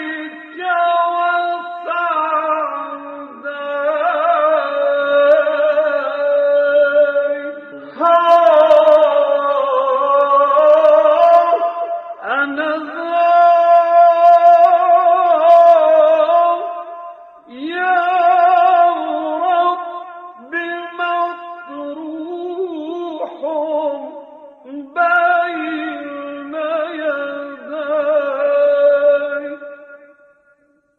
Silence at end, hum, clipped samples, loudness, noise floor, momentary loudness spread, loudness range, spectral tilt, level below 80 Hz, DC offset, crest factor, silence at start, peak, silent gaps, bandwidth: 1 s; none; under 0.1%; -14 LUFS; -57 dBFS; 18 LU; 10 LU; -4 dB/octave; -70 dBFS; under 0.1%; 14 dB; 0 s; 0 dBFS; none; 5.2 kHz